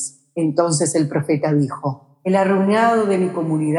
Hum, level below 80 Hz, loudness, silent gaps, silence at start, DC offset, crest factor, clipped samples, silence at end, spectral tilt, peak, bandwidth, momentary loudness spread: none; -74 dBFS; -19 LUFS; none; 0 s; under 0.1%; 16 dB; under 0.1%; 0 s; -6 dB/octave; -4 dBFS; 12 kHz; 10 LU